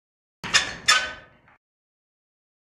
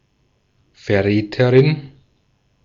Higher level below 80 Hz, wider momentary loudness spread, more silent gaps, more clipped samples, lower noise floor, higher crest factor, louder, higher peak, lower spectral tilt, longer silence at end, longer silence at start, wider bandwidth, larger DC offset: about the same, -58 dBFS vs -54 dBFS; first, 18 LU vs 12 LU; neither; neither; second, -43 dBFS vs -63 dBFS; first, 26 dB vs 18 dB; second, -21 LUFS vs -16 LUFS; about the same, -4 dBFS vs -2 dBFS; second, 0.5 dB/octave vs -8.5 dB/octave; first, 1.5 s vs 0.75 s; second, 0.45 s vs 0.85 s; first, 14.5 kHz vs 7.2 kHz; neither